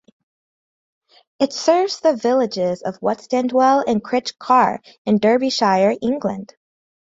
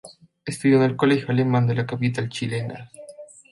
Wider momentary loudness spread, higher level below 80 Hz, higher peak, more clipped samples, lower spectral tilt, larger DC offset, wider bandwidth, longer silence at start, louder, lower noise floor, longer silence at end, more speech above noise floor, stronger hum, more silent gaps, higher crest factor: second, 8 LU vs 21 LU; about the same, -62 dBFS vs -62 dBFS; first, -2 dBFS vs -6 dBFS; neither; second, -5 dB/octave vs -7 dB/octave; neither; second, 7.8 kHz vs 11.5 kHz; first, 1.4 s vs 0.05 s; first, -18 LUFS vs -22 LUFS; first, under -90 dBFS vs -43 dBFS; first, 0.55 s vs 0.25 s; first, over 72 dB vs 22 dB; neither; first, 4.98-5.05 s vs none; about the same, 18 dB vs 16 dB